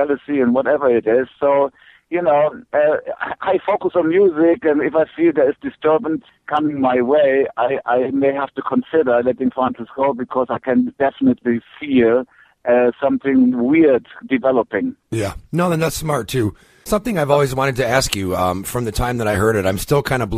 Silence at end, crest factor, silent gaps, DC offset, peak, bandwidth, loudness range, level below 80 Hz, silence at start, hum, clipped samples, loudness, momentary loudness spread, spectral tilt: 0 s; 18 dB; none; under 0.1%; 0 dBFS; 15.5 kHz; 2 LU; -42 dBFS; 0 s; none; under 0.1%; -18 LUFS; 8 LU; -6 dB/octave